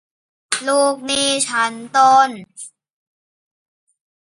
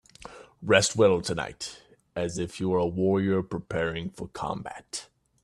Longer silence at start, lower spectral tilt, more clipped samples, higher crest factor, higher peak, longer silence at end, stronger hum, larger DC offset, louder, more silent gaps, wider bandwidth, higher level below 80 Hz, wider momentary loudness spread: first, 0.5 s vs 0.2 s; second, -1 dB/octave vs -4.5 dB/octave; neither; about the same, 20 dB vs 22 dB; first, 0 dBFS vs -6 dBFS; first, 1.65 s vs 0.4 s; neither; neither; first, -16 LUFS vs -27 LUFS; neither; second, 11.5 kHz vs 13 kHz; second, -64 dBFS vs -56 dBFS; first, 22 LU vs 16 LU